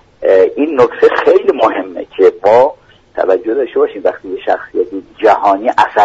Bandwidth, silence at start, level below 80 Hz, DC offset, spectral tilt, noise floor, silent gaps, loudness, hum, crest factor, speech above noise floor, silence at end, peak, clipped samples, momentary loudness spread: 7.8 kHz; 0.2 s; -52 dBFS; under 0.1%; -5.5 dB/octave; -32 dBFS; none; -12 LUFS; none; 12 dB; 20 dB; 0 s; 0 dBFS; under 0.1%; 9 LU